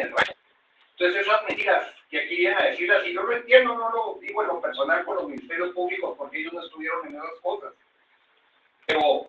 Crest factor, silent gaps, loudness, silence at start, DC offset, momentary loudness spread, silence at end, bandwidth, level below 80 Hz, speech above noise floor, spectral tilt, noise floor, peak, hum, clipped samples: 24 dB; none; -24 LUFS; 0 s; under 0.1%; 12 LU; 0 s; 8.2 kHz; -70 dBFS; 40 dB; -4 dB/octave; -64 dBFS; -2 dBFS; none; under 0.1%